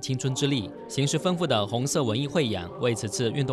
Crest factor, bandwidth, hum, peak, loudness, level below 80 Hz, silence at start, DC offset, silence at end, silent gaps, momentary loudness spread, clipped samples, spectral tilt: 16 dB; 14 kHz; none; -12 dBFS; -26 LUFS; -62 dBFS; 0 s; under 0.1%; 0 s; none; 3 LU; under 0.1%; -5 dB/octave